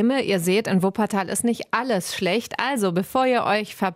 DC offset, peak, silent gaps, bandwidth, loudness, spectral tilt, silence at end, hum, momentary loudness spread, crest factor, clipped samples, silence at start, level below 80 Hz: under 0.1%; -4 dBFS; none; 16 kHz; -22 LUFS; -4.5 dB/octave; 0 s; none; 3 LU; 18 dB; under 0.1%; 0 s; -62 dBFS